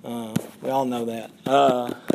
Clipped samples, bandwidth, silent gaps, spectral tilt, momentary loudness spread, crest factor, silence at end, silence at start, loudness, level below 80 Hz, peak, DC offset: under 0.1%; 15.5 kHz; none; -5.5 dB/octave; 12 LU; 18 dB; 0 s; 0.05 s; -24 LUFS; -68 dBFS; -6 dBFS; under 0.1%